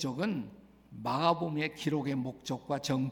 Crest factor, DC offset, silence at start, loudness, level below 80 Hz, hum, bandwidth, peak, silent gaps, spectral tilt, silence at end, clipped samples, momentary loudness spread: 20 dB; under 0.1%; 0 s; -33 LUFS; -68 dBFS; none; 18 kHz; -14 dBFS; none; -5.5 dB/octave; 0 s; under 0.1%; 11 LU